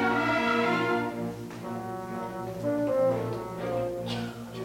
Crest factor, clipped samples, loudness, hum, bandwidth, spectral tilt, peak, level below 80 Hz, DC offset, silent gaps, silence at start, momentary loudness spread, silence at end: 14 dB; under 0.1%; -30 LUFS; none; 17 kHz; -6 dB/octave; -14 dBFS; -58 dBFS; under 0.1%; none; 0 s; 11 LU; 0 s